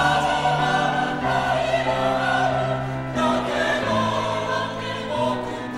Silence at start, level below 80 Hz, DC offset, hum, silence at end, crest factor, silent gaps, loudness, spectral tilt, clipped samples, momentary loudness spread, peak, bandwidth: 0 s; -46 dBFS; under 0.1%; none; 0 s; 16 dB; none; -22 LUFS; -5 dB/octave; under 0.1%; 6 LU; -6 dBFS; 13.5 kHz